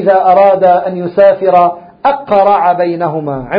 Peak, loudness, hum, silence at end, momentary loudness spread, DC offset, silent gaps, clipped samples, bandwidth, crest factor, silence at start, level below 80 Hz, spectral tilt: 0 dBFS; -10 LUFS; none; 0 s; 9 LU; under 0.1%; none; 0.4%; 5.2 kHz; 10 dB; 0 s; -50 dBFS; -9 dB/octave